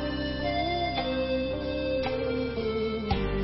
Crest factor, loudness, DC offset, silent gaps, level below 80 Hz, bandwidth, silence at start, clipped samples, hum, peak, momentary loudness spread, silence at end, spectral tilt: 16 dB; -29 LUFS; under 0.1%; none; -40 dBFS; 5.8 kHz; 0 s; under 0.1%; none; -14 dBFS; 2 LU; 0 s; -10 dB/octave